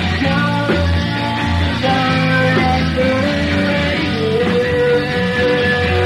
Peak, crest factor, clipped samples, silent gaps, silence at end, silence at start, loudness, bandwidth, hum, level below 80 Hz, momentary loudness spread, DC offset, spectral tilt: -2 dBFS; 14 dB; under 0.1%; none; 0 s; 0 s; -15 LUFS; 12.5 kHz; none; -30 dBFS; 3 LU; under 0.1%; -6.5 dB/octave